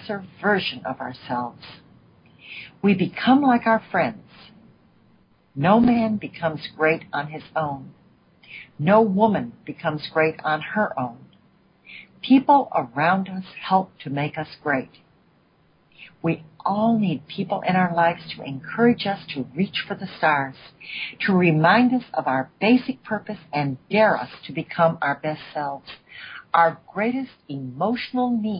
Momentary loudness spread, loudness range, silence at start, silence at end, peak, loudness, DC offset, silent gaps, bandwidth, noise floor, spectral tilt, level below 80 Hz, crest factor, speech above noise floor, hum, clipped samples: 17 LU; 5 LU; 0 s; 0 s; -4 dBFS; -22 LUFS; under 0.1%; none; 5.4 kHz; -60 dBFS; -11 dB/octave; -60 dBFS; 20 dB; 38 dB; none; under 0.1%